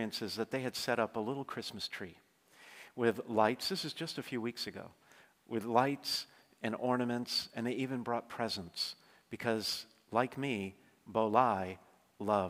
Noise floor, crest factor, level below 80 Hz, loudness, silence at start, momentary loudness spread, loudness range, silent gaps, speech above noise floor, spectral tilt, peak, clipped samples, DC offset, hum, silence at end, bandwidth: -60 dBFS; 22 dB; -80 dBFS; -36 LUFS; 0 s; 14 LU; 2 LU; none; 25 dB; -4.5 dB/octave; -14 dBFS; under 0.1%; under 0.1%; none; 0 s; 16 kHz